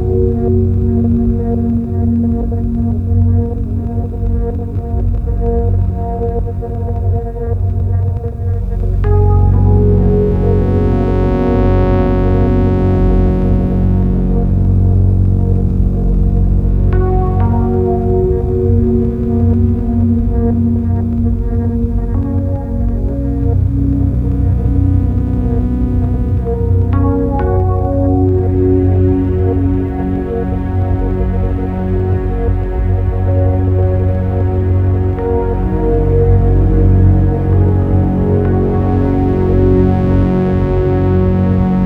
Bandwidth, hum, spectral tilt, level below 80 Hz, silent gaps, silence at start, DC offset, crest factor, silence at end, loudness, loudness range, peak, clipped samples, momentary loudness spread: 3.5 kHz; none; -11.5 dB/octave; -18 dBFS; none; 0 s; under 0.1%; 12 dB; 0 s; -14 LUFS; 4 LU; 0 dBFS; under 0.1%; 6 LU